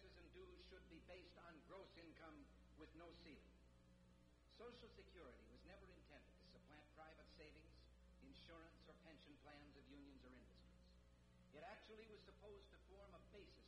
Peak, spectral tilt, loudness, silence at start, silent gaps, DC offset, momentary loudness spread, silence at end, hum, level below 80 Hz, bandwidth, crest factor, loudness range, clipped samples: -50 dBFS; -5.5 dB/octave; -65 LUFS; 0 s; none; under 0.1%; 6 LU; 0 s; 60 Hz at -75 dBFS; -72 dBFS; 10 kHz; 16 dB; 2 LU; under 0.1%